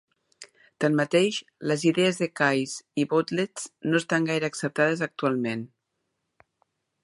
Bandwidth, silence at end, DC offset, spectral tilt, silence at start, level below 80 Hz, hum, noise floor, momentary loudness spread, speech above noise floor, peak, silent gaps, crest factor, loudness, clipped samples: 11.5 kHz; 1.4 s; under 0.1%; -5 dB/octave; 0.4 s; -74 dBFS; none; -79 dBFS; 9 LU; 54 dB; -8 dBFS; none; 20 dB; -26 LUFS; under 0.1%